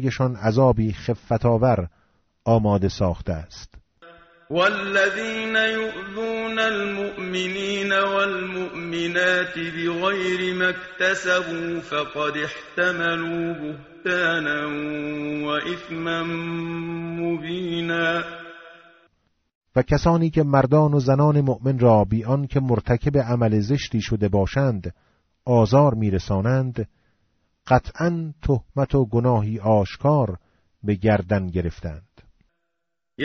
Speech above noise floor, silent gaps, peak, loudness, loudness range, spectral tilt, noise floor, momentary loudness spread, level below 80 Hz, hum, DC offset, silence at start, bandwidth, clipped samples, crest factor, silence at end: 60 dB; 19.55-19.61 s; -4 dBFS; -22 LUFS; 6 LU; -5 dB/octave; -81 dBFS; 11 LU; -42 dBFS; none; under 0.1%; 0 s; 8 kHz; under 0.1%; 18 dB; 0 s